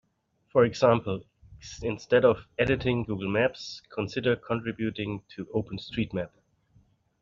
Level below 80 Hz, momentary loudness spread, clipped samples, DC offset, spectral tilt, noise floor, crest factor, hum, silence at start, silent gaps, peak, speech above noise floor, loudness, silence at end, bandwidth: -54 dBFS; 15 LU; under 0.1%; under 0.1%; -5 dB/octave; -71 dBFS; 22 dB; none; 0.55 s; none; -6 dBFS; 44 dB; -28 LUFS; 0.95 s; 7.6 kHz